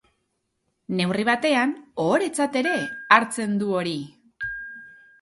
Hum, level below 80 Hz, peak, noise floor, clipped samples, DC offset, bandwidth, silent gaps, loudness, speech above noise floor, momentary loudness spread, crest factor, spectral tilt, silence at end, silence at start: none; -64 dBFS; 0 dBFS; -75 dBFS; under 0.1%; under 0.1%; 11.5 kHz; none; -23 LUFS; 52 dB; 15 LU; 24 dB; -4.5 dB/octave; 0.3 s; 0.9 s